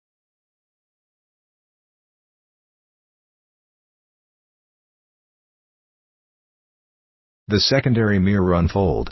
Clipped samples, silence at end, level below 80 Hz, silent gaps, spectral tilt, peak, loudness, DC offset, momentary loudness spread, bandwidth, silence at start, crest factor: under 0.1%; 0 s; -38 dBFS; none; -6.5 dB/octave; -4 dBFS; -18 LUFS; under 0.1%; 3 LU; 6.2 kHz; 7.5 s; 22 dB